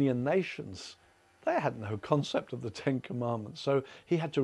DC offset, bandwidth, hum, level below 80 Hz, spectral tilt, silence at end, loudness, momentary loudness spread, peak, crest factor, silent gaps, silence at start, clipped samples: under 0.1%; 11.5 kHz; none; -72 dBFS; -6.5 dB/octave; 0 s; -33 LUFS; 10 LU; -12 dBFS; 22 dB; none; 0 s; under 0.1%